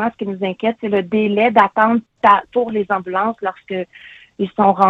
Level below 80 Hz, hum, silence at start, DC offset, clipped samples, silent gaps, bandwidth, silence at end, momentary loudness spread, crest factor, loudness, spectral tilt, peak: -60 dBFS; none; 0 s; under 0.1%; under 0.1%; none; 6.4 kHz; 0 s; 12 LU; 16 dB; -17 LUFS; -8 dB/octave; 0 dBFS